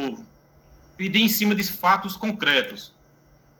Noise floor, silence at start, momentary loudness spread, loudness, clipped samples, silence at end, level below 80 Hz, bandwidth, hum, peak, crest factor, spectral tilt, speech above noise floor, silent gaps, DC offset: -56 dBFS; 0 s; 14 LU; -22 LUFS; under 0.1%; 0.75 s; -60 dBFS; 19.5 kHz; none; -6 dBFS; 20 dB; -3.5 dB/octave; 34 dB; none; under 0.1%